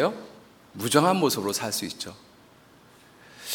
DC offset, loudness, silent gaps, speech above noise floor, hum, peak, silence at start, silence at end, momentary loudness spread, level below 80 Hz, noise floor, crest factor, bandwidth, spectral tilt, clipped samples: under 0.1%; -25 LUFS; none; 29 dB; none; -4 dBFS; 0 s; 0 s; 21 LU; -70 dBFS; -54 dBFS; 24 dB; 19 kHz; -4 dB/octave; under 0.1%